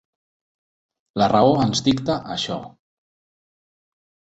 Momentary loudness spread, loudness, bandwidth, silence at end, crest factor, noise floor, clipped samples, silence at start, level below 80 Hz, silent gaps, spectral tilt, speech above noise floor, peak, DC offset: 13 LU; -20 LUFS; 8.2 kHz; 1.65 s; 20 dB; under -90 dBFS; under 0.1%; 1.15 s; -54 dBFS; none; -5.5 dB/octave; over 71 dB; -2 dBFS; under 0.1%